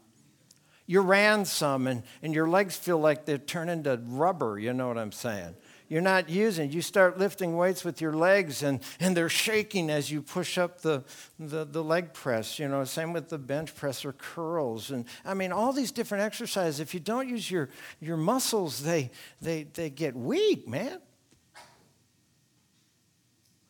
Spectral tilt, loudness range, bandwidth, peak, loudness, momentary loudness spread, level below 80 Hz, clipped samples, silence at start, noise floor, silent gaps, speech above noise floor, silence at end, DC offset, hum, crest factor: -4.5 dB/octave; 7 LU; 19.5 kHz; -8 dBFS; -29 LUFS; 11 LU; -74 dBFS; under 0.1%; 0.9 s; -69 dBFS; none; 40 dB; 2.05 s; under 0.1%; none; 22 dB